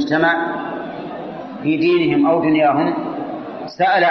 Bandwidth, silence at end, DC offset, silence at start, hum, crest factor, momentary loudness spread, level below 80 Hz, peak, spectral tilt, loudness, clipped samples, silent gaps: 6.2 kHz; 0 s; under 0.1%; 0 s; none; 14 dB; 14 LU; -58 dBFS; -4 dBFS; -4 dB/octave; -17 LUFS; under 0.1%; none